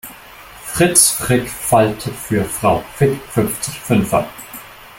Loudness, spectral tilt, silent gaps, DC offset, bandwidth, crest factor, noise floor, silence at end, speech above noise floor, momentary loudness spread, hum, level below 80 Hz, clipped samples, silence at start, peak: -16 LUFS; -4 dB/octave; none; under 0.1%; 17 kHz; 18 dB; -38 dBFS; 0 s; 22 dB; 20 LU; none; -42 dBFS; under 0.1%; 0.05 s; 0 dBFS